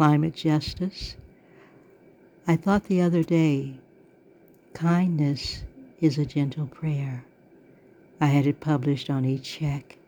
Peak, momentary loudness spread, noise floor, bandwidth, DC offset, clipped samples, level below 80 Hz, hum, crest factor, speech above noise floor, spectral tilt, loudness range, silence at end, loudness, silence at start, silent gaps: -6 dBFS; 14 LU; -55 dBFS; 17.5 kHz; under 0.1%; under 0.1%; -52 dBFS; none; 20 dB; 31 dB; -7.5 dB/octave; 2 LU; 0.25 s; -25 LUFS; 0 s; none